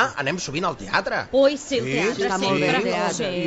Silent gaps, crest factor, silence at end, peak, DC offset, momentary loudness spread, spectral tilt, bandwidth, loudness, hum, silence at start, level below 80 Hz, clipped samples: none; 16 dB; 0 s; -6 dBFS; under 0.1%; 6 LU; -4 dB/octave; 8.4 kHz; -22 LUFS; none; 0 s; -52 dBFS; under 0.1%